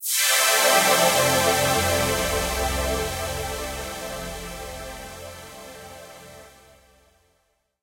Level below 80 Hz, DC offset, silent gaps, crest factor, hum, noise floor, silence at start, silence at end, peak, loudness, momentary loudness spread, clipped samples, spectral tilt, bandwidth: -40 dBFS; under 0.1%; none; 20 dB; none; -69 dBFS; 0 s; 1.35 s; -6 dBFS; -21 LUFS; 23 LU; under 0.1%; -2 dB/octave; 16.5 kHz